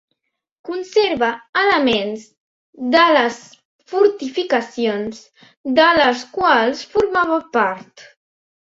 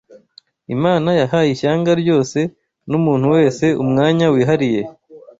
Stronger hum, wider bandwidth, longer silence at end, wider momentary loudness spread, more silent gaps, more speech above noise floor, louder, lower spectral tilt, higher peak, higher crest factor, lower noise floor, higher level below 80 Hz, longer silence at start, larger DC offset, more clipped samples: neither; about the same, 8 kHz vs 8 kHz; first, 0.6 s vs 0.2 s; first, 15 LU vs 8 LU; first, 1.49-1.53 s, 2.37-2.73 s, 3.65-3.79 s, 5.57-5.64 s vs none; first, 56 dB vs 35 dB; about the same, -17 LUFS vs -16 LUFS; second, -4 dB/octave vs -7 dB/octave; about the same, -2 dBFS vs -2 dBFS; about the same, 18 dB vs 14 dB; first, -74 dBFS vs -50 dBFS; about the same, -56 dBFS vs -54 dBFS; about the same, 0.65 s vs 0.7 s; neither; neither